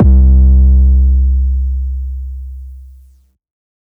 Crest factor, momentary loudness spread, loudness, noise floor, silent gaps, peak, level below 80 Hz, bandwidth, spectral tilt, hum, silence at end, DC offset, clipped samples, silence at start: 10 dB; 19 LU; -11 LUFS; -46 dBFS; none; -2 dBFS; -10 dBFS; 0.9 kHz; -13 dB/octave; none; 1.15 s; under 0.1%; under 0.1%; 0 s